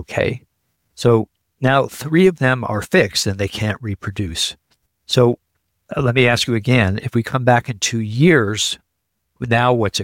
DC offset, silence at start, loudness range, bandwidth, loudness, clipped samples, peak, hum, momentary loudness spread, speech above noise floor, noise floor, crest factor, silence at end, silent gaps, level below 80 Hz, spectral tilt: under 0.1%; 0 s; 3 LU; 17 kHz; -17 LUFS; under 0.1%; -2 dBFS; none; 10 LU; 57 dB; -73 dBFS; 16 dB; 0 s; none; -46 dBFS; -5 dB/octave